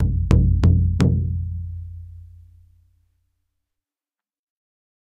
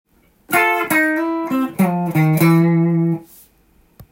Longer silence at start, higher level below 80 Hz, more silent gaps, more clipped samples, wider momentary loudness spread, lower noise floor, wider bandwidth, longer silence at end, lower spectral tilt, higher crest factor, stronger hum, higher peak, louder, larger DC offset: second, 0 s vs 0.5 s; first, -28 dBFS vs -58 dBFS; neither; neither; first, 20 LU vs 7 LU; first, under -90 dBFS vs -55 dBFS; second, 7.8 kHz vs 17 kHz; first, 2.9 s vs 0.1 s; first, -8.5 dB/octave vs -6.5 dB/octave; first, 22 dB vs 14 dB; neither; about the same, 0 dBFS vs -2 dBFS; second, -19 LUFS vs -16 LUFS; neither